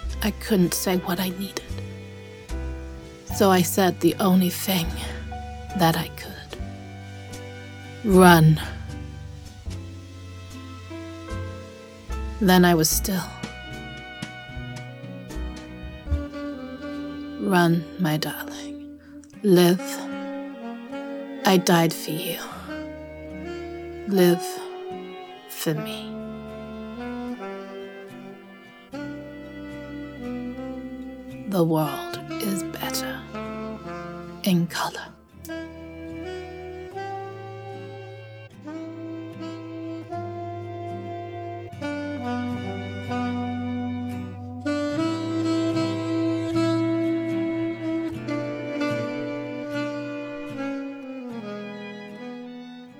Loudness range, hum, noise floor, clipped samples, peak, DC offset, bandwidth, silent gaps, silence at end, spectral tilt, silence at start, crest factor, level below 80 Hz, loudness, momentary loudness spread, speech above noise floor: 15 LU; none; -46 dBFS; under 0.1%; 0 dBFS; under 0.1%; over 20 kHz; none; 0 s; -5.5 dB/octave; 0 s; 26 dB; -42 dBFS; -26 LUFS; 19 LU; 26 dB